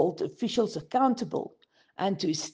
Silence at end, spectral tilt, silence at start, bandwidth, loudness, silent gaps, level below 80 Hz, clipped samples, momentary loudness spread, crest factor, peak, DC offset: 0.05 s; -5 dB/octave; 0 s; 9.8 kHz; -29 LUFS; none; -70 dBFS; under 0.1%; 10 LU; 18 dB; -10 dBFS; under 0.1%